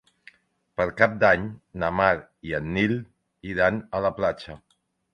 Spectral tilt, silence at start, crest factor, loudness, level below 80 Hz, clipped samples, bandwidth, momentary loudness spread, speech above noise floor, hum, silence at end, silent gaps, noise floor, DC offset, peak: -7 dB/octave; 0.8 s; 22 dB; -24 LUFS; -50 dBFS; under 0.1%; 9.2 kHz; 15 LU; 35 dB; none; 0.55 s; none; -60 dBFS; under 0.1%; -2 dBFS